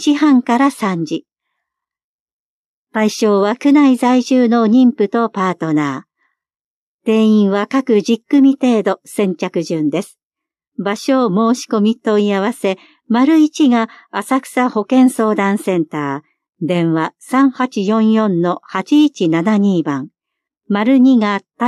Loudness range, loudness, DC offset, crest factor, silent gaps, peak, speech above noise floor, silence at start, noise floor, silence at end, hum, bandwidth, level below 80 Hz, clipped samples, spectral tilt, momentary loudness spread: 4 LU; -14 LUFS; under 0.1%; 12 dB; 2.04-2.26 s, 2.32-2.85 s, 6.56-6.99 s, 10.23-10.30 s, 10.68-10.72 s, 16.49-16.53 s; -2 dBFS; over 76 dB; 0 s; under -90 dBFS; 0 s; none; 13 kHz; -70 dBFS; under 0.1%; -6 dB/octave; 10 LU